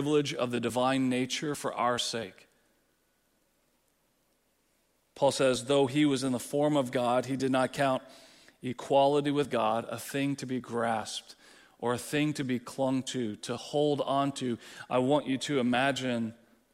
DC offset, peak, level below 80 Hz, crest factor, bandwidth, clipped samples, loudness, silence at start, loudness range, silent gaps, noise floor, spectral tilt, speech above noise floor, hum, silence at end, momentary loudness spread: under 0.1%; -12 dBFS; -70 dBFS; 18 dB; 16 kHz; under 0.1%; -30 LUFS; 0 s; 6 LU; none; -72 dBFS; -5 dB/octave; 43 dB; none; 0.4 s; 9 LU